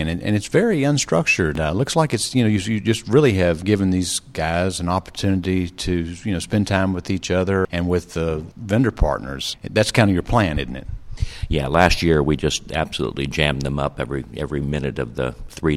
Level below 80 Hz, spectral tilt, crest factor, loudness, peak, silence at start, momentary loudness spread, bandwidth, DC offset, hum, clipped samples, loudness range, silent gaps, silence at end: -34 dBFS; -5.5 dB/octave; 20 dB; -20 LUFS; 0 dBFS; 0 s; 10 LU; 15 kHz; under 0.1%; none; under 0.1%; 3 LU; none; 0 s